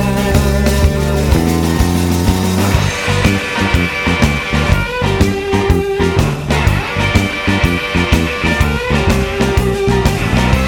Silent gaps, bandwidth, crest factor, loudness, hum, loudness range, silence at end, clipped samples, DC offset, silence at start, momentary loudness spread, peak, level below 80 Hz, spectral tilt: none; 19 kHz; 12 dB; -14 LUFS; none; 1 LU; 0 s; under 0.1%; under 0.1%; 0 s; 2 LU; 0 dBFS; -20 dBFS; -5.5 dB/octave